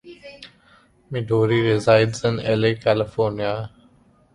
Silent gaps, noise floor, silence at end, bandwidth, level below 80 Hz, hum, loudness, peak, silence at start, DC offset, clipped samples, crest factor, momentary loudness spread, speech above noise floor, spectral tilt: none; -55 dBFS; 0.65 s; 11 kHz; -52 dBFS; none; -20 LUFS; -4 dBFS; 0.05 s; under 0.1%; under 0.1%; 18 dB; 20 LU; 36 dB; -6.5 dB/octave